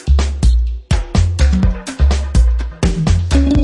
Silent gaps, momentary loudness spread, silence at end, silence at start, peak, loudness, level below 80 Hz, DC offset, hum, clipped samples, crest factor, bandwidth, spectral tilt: none; 5 LU; 0 s; 0.05 s; -2 dBFS; -16 LUFS; -14 dBFS; under 0.1%; none; under 0.1%; 12 dB; 11 kHz; -6.5 dB/octave